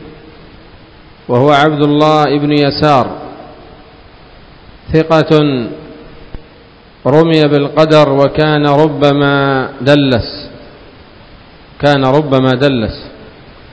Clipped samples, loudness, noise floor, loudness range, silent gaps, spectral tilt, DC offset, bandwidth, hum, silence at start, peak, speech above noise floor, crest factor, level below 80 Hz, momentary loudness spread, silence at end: 0.8%; -10 LUFS; -40 dBFS; 6 LU; none; -7.5 dB/octave; 0.1%; 8 kHz; none; 0 s; 0 dBFS; 30 dB; 12 dB; -38 dBFS; 15 LU; 0.45 s